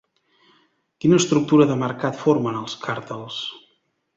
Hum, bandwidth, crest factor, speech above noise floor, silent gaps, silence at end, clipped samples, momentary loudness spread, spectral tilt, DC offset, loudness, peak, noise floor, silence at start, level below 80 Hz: none; 8 kHz; 20 dB; 47 dB; none; 0.6 s; under 0.1%; 13 LU; -5.5 dB/octave; under 0.1%; -21 LUFS; -2 dBFS; -67 dBFS; 1.05 s; -62 dBFS